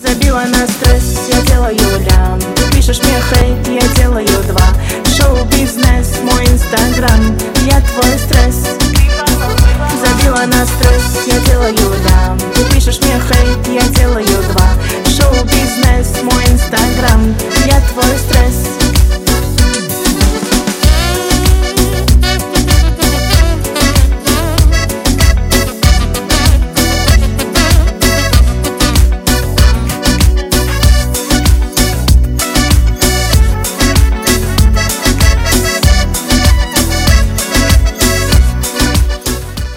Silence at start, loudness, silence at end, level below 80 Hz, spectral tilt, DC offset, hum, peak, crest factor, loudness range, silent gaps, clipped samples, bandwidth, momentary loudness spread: 0 s; -11 LUFS; 0 s; -12 dBFS; -4.5 dB/octave; under 0.1%; none; 0 dBFS; 10 dB; 1 LU; none; 0.5%; 17.5 kHz; 3 LU